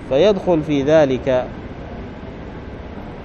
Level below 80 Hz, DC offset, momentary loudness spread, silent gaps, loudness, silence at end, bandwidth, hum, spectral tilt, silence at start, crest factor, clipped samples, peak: -38 dBFS; under 0.1%; 18 LU; none; -16 LUFS; 0 s; 7 kHz; none; -7 dB/octave; 0 s; 16 dB; under 0.1%; -4 dBFS